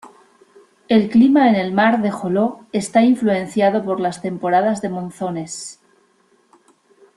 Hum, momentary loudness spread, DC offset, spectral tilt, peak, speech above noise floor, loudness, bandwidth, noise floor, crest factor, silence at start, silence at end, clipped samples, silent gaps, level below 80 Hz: none; 13 LU; under 0.1%; -6 dB/octave; -2 dBFS; 42 dB; -17 LUFS; 12 kHz; -58 dBFS; 16 dB; 0.05 s; 1.45 s; under 0.1%; none; -62 dBFS